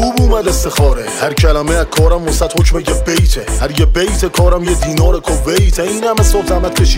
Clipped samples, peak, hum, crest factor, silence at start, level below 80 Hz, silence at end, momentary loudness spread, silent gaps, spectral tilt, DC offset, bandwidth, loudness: under 0.1%; 0 dBFS; none; 10 dB; 0 s; -14 dBFS; 0 s; 3 LU; none; -5 dB/octave; under 0.1%; 16.5 kHz; -13 LUFS